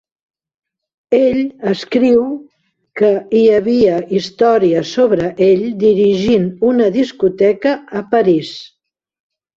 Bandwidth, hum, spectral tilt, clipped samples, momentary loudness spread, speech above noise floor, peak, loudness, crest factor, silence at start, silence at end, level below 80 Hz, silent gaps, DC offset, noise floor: 7.6 kHz; none; -7 dB/octave; under 0.1%; 7 LU; 28 dB; -2 dBFS; -14 LUFS; 12 dB; 1.1 s; 0.9 s; -52 dBFS; none; under 0.1%; -41 dBFS